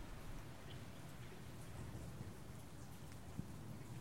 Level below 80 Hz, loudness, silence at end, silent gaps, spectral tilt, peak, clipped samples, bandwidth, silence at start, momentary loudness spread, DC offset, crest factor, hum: -60 dBFS; -54 LUFS; 0 s; none; -5.5 dB/octave; -34 dBFS; under 0.1%; 16.5 kHz; 0 s; 3 LU; 0.1%; 20 dB; none